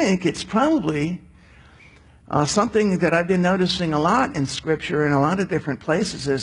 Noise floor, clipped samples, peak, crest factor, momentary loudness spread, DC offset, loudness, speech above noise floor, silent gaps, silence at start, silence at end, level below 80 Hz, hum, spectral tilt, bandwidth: -49 dBFS; under 0.1%; -6 dBFS; 16 dB; 6 LU; under 0.1%; -21 LUFS; 29 dB; none; 0 s; 0 s; -48 dBFS; none; -5.5 dB/octave; 11 kHz